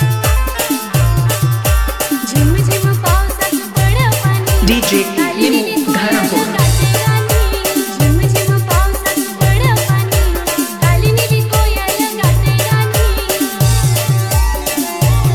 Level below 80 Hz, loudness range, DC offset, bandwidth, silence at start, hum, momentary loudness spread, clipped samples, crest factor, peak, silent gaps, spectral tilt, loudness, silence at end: -20 dBFS; 1 LU; 0.2%; 19 kHz; 0 s; none; 4 LU; under 0.1%; 12 dB; 0 dBFS; none; -5 dB/octave; -13 LUFS; 0 s